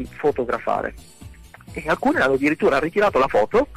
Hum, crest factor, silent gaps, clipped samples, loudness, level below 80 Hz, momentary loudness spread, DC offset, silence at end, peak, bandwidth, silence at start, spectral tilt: none; 12 dB; none; under 0.1%; -20 LUFS; -44 dBFS; 9 LU; under 0.1%; 0 s; -10 dBFS; 14.5 kHz; 0 s; -6 dB/octave